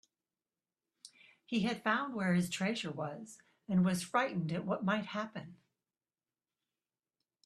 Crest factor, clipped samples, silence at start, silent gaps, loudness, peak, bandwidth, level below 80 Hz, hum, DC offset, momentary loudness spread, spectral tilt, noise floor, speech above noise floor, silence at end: 22 dB; under 0.1%; 1.05 s; none; -35 LUFS; -16 dBFS; 13 kHz; -74 dBFS; none; under 0.1%; 16 LU; -5.5 dB/octave; under -90 dBFS; over 55 dB; 1.9 s